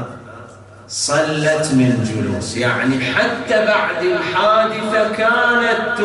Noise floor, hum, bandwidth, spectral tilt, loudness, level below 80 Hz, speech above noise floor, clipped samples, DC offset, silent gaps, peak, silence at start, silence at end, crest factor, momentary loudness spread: -38 dBFS; none; 11.5 kHz; -4.5 dB/octave; -16 LUFS; -54 dBFS; 22 dB; under 0.1%; under 0.1%; none; -4 dBFS; 0 s; 0 s; 12 dB; 7 LU